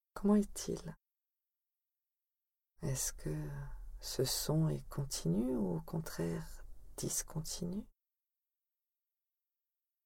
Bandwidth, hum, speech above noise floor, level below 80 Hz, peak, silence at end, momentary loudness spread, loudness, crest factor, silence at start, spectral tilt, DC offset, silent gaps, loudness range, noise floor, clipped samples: 17.5 kHz; none; over 53 dB; -54 dBFS; -20 dBFS; 2.15 s; 15 LU; -38 LUFS; 20 dB; 0.15 s; -5 dB/octave; under 0.1%; none; 7 LU; under -90 dBFS; under 0.1%